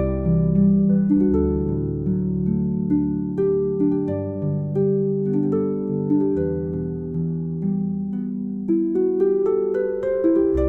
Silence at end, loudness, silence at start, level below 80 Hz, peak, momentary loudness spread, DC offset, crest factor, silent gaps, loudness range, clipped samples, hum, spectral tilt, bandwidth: 0 s; -21 LUFS; 0 s; -38 dBFS; -8 dBFS; 8 LU; under 0.1%; 12 dB; none; 3 LU; under 0.1%; none; -13 dB/octave; 2.5 kHz